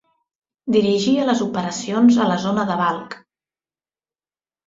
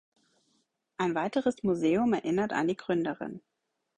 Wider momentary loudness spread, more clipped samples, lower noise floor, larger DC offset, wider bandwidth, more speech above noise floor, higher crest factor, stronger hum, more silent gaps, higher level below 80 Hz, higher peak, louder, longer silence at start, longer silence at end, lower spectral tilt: first, 16 LU vs 13 LU; neither; first, under -90 dBFS vs -75 dBFS; neither; second, 7.8 kHz vs 10 kHz; first, over 72 dB vs 46 dB; about the same, 16 dB vs 16 dB; neither; neither; first, -62 dBFS vs -68 dBFS; first, -4 dBFS vs -16 dBFS; first, -18 LUFS vs -29 LUFS; second, 0.65 s vs 1 s; first, 1.5 s vs 0.6 s; about the same, -5.5 dB/octave vs -6.5 dB/octave